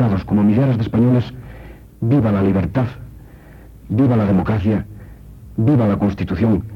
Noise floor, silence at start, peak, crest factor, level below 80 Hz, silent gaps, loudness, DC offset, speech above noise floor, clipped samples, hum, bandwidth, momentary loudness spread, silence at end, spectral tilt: -40 dBFS; 0 s; -6 dBFS; 12 dB; -38 dBFS; none; -17 LUFS; under 0.1%; 24 dB; under 0.1%; none; 6 kHz; 13 LU; 0 s; -10 dB/octave